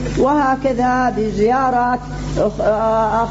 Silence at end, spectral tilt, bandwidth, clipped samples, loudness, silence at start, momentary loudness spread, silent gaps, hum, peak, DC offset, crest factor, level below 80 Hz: 0 s; -6.5 dB/octave; 8 kHz; under 0.1%; -17 LUFS; 0 s; 5 LU; none; 50 Hz at -30 dBFS; -6 dBFS; under 0.1%; 10 dB; -32 dBFS